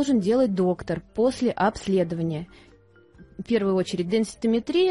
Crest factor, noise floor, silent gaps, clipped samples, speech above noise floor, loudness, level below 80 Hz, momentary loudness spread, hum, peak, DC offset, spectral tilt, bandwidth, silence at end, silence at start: 14 dB; -54 dBFS; none; under 0.1%; 31 dB; -24 LUFS; -54 dBFS; 9 LU; none; -10 dBFS; under 0.1%; -6.5 dB/octave; 11.5 kHz; 0 s; 0 s